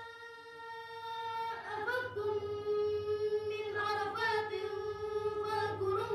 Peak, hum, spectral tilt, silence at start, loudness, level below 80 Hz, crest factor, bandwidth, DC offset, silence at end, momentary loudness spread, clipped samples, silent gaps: -22 dBFS; none; -5 dB/octave; 0 s; -36 LUFS; -68 dBFS; 14 dB; 13 kHz; under 0.1%; 0 s; 12 LU; under 0.1%; none